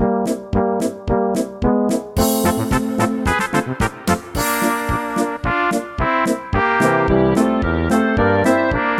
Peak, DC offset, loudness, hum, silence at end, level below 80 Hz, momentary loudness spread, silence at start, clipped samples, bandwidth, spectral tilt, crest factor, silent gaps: -2 dBFS; under 0.1%; -18 LUFS; none; 0 s; -32 dBFS; 5 LU; 0 s; under 0.1%; 17 kHz; -5.5 dB/octave; 16 dB; none